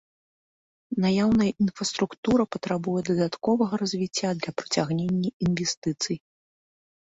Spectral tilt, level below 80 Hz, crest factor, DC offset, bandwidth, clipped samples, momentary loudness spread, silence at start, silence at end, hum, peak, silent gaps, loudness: -5 dB/octave; -56 dBFS; 18 dB; under 0.1%; 8 kHz; under 0.1%; 6 LU; 0.9 s; 0.95 s; none; -8 dBFS; 2.18-2.23 s, 5.33-5.40 s, 5.77-5.82 s; -26 LUFS